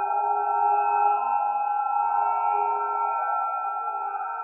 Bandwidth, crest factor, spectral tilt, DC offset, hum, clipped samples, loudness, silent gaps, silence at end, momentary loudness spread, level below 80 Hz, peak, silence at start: 2.9 kHz; 12 dB; -4.5 dB/octave; under 0.1%; none; under 0.1%; -25 LUFS; none; 0 s; 7 LU; under -90 dBFS; -12 dBFS; 0 s